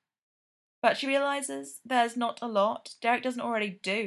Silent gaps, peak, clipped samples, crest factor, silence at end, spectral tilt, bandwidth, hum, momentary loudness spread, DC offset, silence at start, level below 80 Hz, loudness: none; -8 dBFS; under 0.1%; 22 dB; 0 s; -3 dB/octave; 12.5 kHz; none; 5 LU; under 0.1%; 0.85 s; -84 dBFS; -29 LUFS